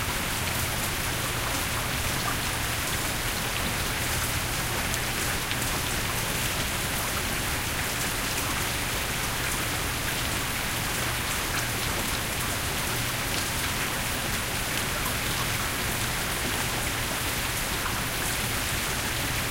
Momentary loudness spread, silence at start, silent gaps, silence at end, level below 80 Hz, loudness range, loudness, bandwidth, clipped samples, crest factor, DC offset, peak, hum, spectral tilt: 1 LU; 0 s; none; 0 s; -38 dBFS; 0 LU; -27 LUFS; 16 kHz; under 0.1%; 22 dB; 0.1%; -6 dBFS; none; -2.5 dB/octave